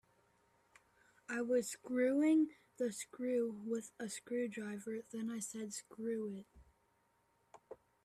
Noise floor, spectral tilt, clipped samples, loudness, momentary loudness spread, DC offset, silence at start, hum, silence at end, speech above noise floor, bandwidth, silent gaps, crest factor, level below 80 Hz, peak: -77 dBFS; -4.5 dB/octave; under 0.1%; -39 LUFS; 14 LU; under 0.1%; 1.3 s; none; 0.3 s; 38 dB; 14 kHz; none; 16 dB; -78 dBFS; -24 dBFS